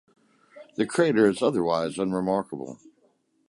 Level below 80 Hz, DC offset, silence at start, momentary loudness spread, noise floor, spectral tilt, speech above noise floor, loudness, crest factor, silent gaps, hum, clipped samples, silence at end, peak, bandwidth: -64 dBFS; under 0.1%; 0.55 s; 16 LU; -66 dBFS; -6 dB/octave; 42 dB; -25 LUFS; 18 dB; none; none; under 0.1%; 0.75 s; -8 dBFS; 11.5 kHz